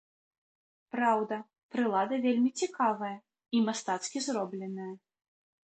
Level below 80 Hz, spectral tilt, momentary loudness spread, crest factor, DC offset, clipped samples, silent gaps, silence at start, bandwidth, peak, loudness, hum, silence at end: -82 dBFS; -4 dB/octave; 12 LU; 18 dB; under 0.1%; under 0.1%; 1.63-1.69 s; 0.95 s; 9 kHz; -14 dBFS; -32 LUFS; none; 0.8 s